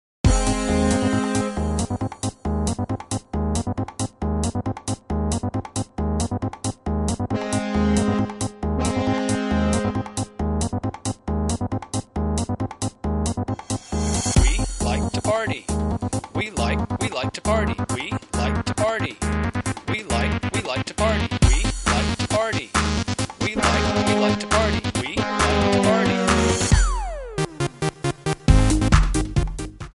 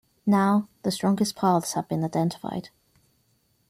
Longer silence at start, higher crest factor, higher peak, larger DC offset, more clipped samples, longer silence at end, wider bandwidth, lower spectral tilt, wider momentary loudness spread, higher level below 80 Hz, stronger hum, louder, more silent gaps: about the same, 0.25 s vs 0.25 s; about the same, 20 dB vs 16 dB; first, -2 dBFS vs -10 dBFS; neither; neither; second, 0.05 s vs 1 s; second, 11.5 kHz vs 15 kHz; about the same, -5 dB/octave vs -6 dB/octave; about the same, 9 LU vs 10 LU; first, -28 dBFS vs -66 dBFS; neither; about the same, -23 LUFS vs -25 LUFS; neither